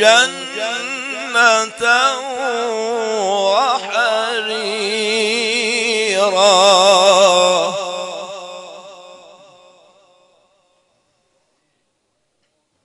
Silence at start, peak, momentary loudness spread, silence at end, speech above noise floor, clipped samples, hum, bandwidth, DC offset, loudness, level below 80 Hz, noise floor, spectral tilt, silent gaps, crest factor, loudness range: 0 s; 0 dBFS; 15 LU; 3.7 s; 54 dB; under 0.1%; none; 11 kHz; under 0.1%; -14 LUFS; -72 dBFS; -68 dBFS; -1 dB/octave; none; 16 dB; 8 LU